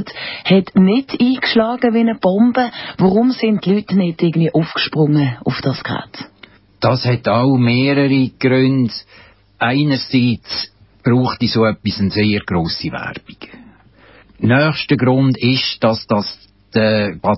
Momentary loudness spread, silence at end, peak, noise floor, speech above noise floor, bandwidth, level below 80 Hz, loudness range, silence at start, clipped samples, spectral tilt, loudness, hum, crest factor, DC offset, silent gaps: 10 LU; 0 s; -2 dBFS; -46 dBFS; 31 dB; 5.8 kHz; -46 dBFS; 3 LU; 0 s; under 0.1%; -10 dB/octave; -16 LUFS; none; 14 dB; under 0.1%; none